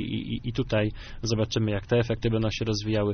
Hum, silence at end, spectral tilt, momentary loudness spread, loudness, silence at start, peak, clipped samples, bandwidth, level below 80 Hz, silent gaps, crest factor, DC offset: none; 0 s; -6 dB/octave; 6 LU; -27 LUFS; 0 s; -10 dBFS; under 0.1%; 6.6 kHz; -42 dBFS; none; 16 dB; under 0.1%